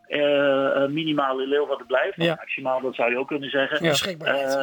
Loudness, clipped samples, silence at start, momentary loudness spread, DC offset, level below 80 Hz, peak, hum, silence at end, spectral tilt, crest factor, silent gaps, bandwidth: -23 LUFS; under 0.1%; 0.1 s; 5 LU; under 0.1%; -70 dBFS; -8 dBFS; none; 0 s; -4.5 dB/octave; 16 dB; none; 19 kHz